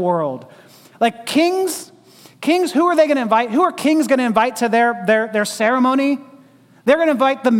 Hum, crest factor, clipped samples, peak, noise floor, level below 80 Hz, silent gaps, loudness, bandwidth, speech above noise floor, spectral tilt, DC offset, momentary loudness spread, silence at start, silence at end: none; 14 dB; under 0.1%; -2 dBFS; -48 dBFS; -66 dBFS; none; -17 LUFS; 17 kHz; 32 dB; -4.5 dB/octave; under 0.1%; 8 LU; 0 s; 0 s